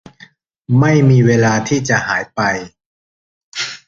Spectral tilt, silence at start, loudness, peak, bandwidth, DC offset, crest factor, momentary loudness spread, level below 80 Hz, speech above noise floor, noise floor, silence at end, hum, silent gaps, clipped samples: -6 dB/octave; 0.7 s; -14 LUFS; 0 dBFS; 7.6 kHz; under 0.1%; 14 dB; 13 LU; -48 dBFS; 33 dB; -46 dBFS; 0.1 s; none; 2.86-3.52 s; under 0.1%